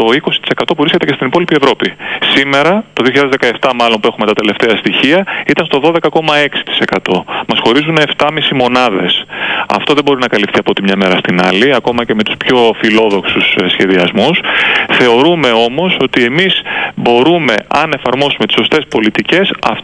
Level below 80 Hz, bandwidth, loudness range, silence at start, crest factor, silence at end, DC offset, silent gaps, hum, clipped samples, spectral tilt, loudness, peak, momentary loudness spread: -48 dBFS; 10.5 kHz; 2 LU; 0 s; 10 dB; 0 s; under 0.1%; none; none; under 0.1%; -5 dB/octave; -10 LUFS; 0 dBFS; 4 LU